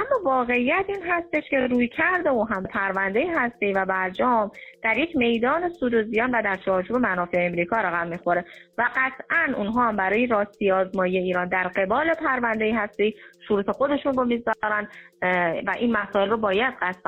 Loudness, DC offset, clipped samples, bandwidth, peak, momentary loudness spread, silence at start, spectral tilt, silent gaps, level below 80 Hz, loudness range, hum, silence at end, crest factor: -23 LUFS; under 0.1%; under 0.1%; 7.4 kHz; -10 dBFS; 4 LU; 0 s; -7.5 dB/octave; none; -56 dBFS; 1 LU; none; 0.1 s; 14 dB